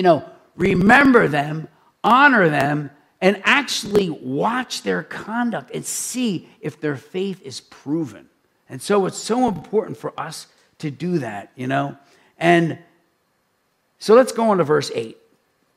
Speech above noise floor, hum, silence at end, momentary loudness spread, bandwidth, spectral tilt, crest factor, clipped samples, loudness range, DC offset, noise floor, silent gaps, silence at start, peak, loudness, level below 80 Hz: 48 dB; none; 0.65 s; 18 LU; 16 kHz; -5 dB/octave; 20 dB; under 0.1%; 9 LU; under 0.1%; -67 dBFS; none; 0 s; 0 dBFS; -19 LUFS; -54 dBFS